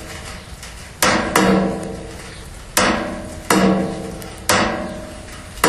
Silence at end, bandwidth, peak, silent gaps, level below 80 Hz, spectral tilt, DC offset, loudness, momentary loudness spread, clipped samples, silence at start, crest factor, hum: 0 s; 14 kHz; 0 dBFS; none; -38 dBFS; -4 dB/octave; under 0.1%; -18 LUFS; 19 LU; under 0.1%; 0 s; 20 dB; none